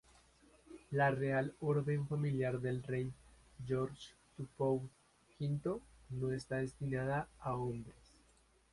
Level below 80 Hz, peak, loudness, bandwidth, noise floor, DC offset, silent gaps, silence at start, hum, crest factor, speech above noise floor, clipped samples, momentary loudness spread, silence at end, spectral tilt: -64 dBFS; -20 dBFS; -39 LUFS; 11.5 kHz; -70 dBFS; under 0.1%; none; 0.7 s; none; 20 dB; 32 dB; under 0.1%; 16 LU; 0.8 s; -8 dB/octave